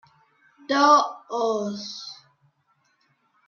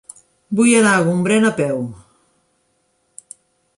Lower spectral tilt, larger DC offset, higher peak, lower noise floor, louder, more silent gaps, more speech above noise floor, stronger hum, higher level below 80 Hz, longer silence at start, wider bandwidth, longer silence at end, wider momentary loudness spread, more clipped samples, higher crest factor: second, -3.5 dB/octave vs -5 dB/octave; neither; about the same, -4 dBFS vs -2 dBFS; about the same, -68 dBFS vs -65 dBFS; second, -22 LUFS vs -15 LUFS; neither; second, 46 dB vs 50 dB; neither; second, -80 dBFS vs -60 dBFS; first, 0.7 s vs 0.5 s; second, 7 kHz vs 11.5 kHz; second, 1.35 s vs 1.85 s; about the same, 19 LU vs 20 LU; neither; about the same, 22 dB vs 18 dB